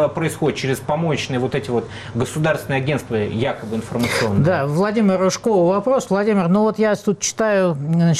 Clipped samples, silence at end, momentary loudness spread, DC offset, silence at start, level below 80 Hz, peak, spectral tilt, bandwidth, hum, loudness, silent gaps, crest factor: under 0.1%; 0 s; 6 LU; under 0.1%; 0 s; -50 dBFS; -8 dBFS; -5.5 dB/octave; 14.5 kHz; none; -19 LUFS; none; 10 dB